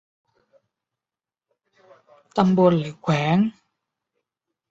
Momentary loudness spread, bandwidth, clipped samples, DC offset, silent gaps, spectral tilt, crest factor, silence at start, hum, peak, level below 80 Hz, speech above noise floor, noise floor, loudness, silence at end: 8 LU; 7.6 kHz; under 0.1%; under 0.1%; none; -8 dB/octave; 22 dB; 2.35 s; none; -4 dBFS; -60 dBFS; over 71 dB; under -90 dBFS; -21 LUFS; 1.2 s